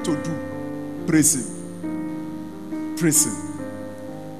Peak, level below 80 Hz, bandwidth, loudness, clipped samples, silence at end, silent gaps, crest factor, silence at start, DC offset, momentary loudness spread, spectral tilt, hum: -2 dBFS; -60 dBFS; 14 kHz; -23 LUFS; under 0.1%; 0 s; none; 22 dB; 0 s; 0.8%; 16 LU; -4 dB/octave; 50 Hz at -50 dBFS